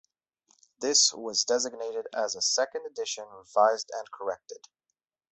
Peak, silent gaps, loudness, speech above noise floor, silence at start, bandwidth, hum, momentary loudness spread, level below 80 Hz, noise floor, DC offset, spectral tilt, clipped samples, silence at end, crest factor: -8 dBFS; none; -27 LUFS; 56 dB; 0.8 s; 8.4 kHz; none; 16 LU; -78 dBFS; -85 dBFS; under 0.1%; 0.5 dB/octave; under 0.1%; 0.75 s; 22 dB